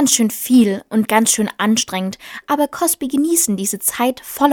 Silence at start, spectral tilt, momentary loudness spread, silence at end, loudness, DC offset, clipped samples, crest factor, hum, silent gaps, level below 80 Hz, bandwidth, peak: 0 s; -3 dB/octave; 8 LU; 0 s; -16 LUFS; under 0.1%; under 0.1%; 16 dB; none; none; -58 dBFS; over 20 kHz; 0 dBFS